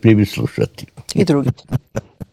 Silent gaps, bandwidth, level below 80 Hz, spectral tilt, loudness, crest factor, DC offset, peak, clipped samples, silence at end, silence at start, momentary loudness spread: none; 15 kHz; -46 dBFS; -7 dB/octave; -18 LUFS; 18 dB; under 0.1%; 0 dBFS; 0.1%; 0.1 s; 0.05 s; 14 LU